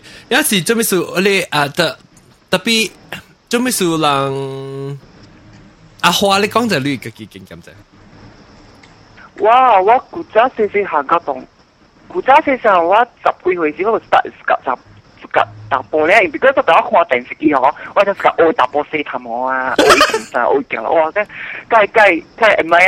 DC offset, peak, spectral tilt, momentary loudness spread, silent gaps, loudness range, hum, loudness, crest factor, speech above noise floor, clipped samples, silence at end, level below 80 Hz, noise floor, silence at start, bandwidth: under 0.1%; 0 dBFS; -3.5 dB/octave; 13 LU; none; 5 LU; none; -14 LUFS; 14 dB; 35 dB; under 0.1%; 0 s; -52 dBFS; -49 dBFS; 0.05 s; 17 kHz